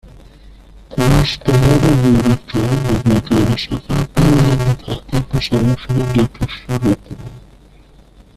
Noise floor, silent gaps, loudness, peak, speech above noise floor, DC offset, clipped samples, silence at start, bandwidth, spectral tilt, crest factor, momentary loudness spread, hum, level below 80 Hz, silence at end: -44 dBFS; none; -15 LUFS; -2 dBFS; 30 dB; under 0.1%; under 0.1%; 0.9 s; 14 kHz; -6.5 dB/octave; 14 dB; 10 LU; none; -28 dBFS; 1 s